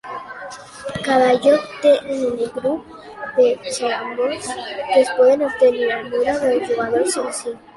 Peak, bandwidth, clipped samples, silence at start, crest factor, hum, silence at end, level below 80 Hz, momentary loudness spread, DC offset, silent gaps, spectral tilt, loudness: -2 dBFS; 11.5 kHz; under 0.1%; 0.05 s; 16 dB; none; 0.2 s; -56 dBFS; 16 LU; under 0.1%; none; -3.5 dB/octave; -18 LUFS